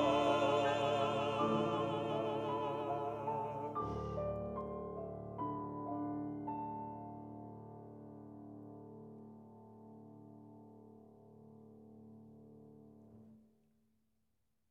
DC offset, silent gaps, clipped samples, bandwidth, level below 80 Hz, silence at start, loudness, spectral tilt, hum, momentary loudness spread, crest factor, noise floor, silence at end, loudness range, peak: under 0.1%; none; under 0.1%; 10.5 kHz; -64 dBFS; 0 s; -39 LUFS; -6.5 dB/octave; none; 25 LU; 20 dB; -85 dBFS; 1.3 s; 22 LU; -22 dBFS